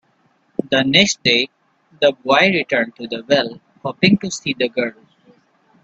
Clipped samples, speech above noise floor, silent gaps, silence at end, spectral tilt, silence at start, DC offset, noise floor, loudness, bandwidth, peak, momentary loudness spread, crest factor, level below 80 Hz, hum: under 0.1%; 43 dB; none; 0.9 s; -4 dB/octave; 0.7 s; under 0.1%; -60 dBFS; -17 LUFS; 8.4 kHz; 0 dBFS; 14 LU; 18 dB; -58 dBFS; none